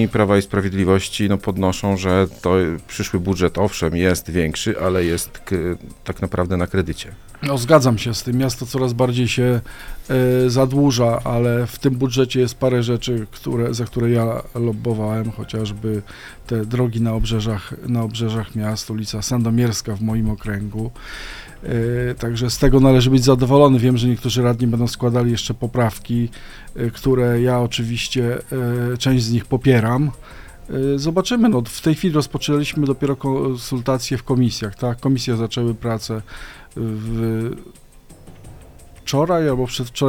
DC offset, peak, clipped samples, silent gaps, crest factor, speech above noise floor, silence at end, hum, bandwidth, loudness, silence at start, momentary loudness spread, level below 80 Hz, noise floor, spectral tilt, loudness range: under 0.1%; 0 dBFS; under 0.1%; none; 18 dB; 24 dB; 0 s; none; 17 kHz; -19 LUFS; 0 s; 10 LU; -36 dBFS; -43 dBFS; -6 dB/octave; 7 LU